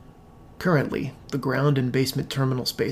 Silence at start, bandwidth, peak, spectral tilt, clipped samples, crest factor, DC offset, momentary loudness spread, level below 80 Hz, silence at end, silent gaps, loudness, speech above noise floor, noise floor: 0 s; 16 kHz; -8 dBFS; -6 dB/octave; under 0.1%; 18 dB; under 0.1%; 7 LU; -52 dBFS; 0 s; none; -25 LUFS; 24 dB; -48 dBFS